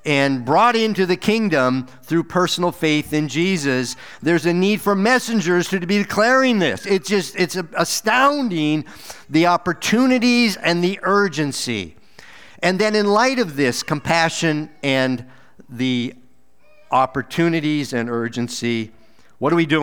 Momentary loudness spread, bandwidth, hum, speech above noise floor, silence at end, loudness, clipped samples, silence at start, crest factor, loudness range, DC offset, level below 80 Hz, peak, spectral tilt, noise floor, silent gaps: 8 LU; over 20 kHz; none; 39 dB; 0 s; -19 LUFS; under 0.1%; 0.05 s; 18 dB; 4 LU; 0.6%; -58 dBFS; -2 dBFS; -4.5 dB/octave; -57 dBFS; none